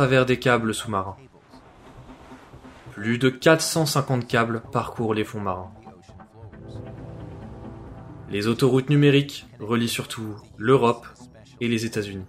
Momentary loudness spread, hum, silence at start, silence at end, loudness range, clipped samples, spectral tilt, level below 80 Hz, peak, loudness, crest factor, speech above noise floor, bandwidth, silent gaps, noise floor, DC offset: 21 LU; none; 0 s; 0 s; 9 LU; under 0.1%; -5.5 dB/octave; -52 dBFS; -2 dBFS; -23 LUFS; 22 dB; 27 dB; 16 kHz; none; -50 dBFS; under 0.1%